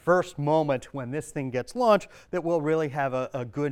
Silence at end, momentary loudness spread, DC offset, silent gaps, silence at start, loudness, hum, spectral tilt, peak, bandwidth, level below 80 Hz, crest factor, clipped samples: 0 s; 10 LU; under 0.1%; none; 0.05 s; -27 LUFS; none; -6.5 dB/octave; -8 dBFS; 14.5 kHz; -60 dBFS; 18 dB; under 0.1%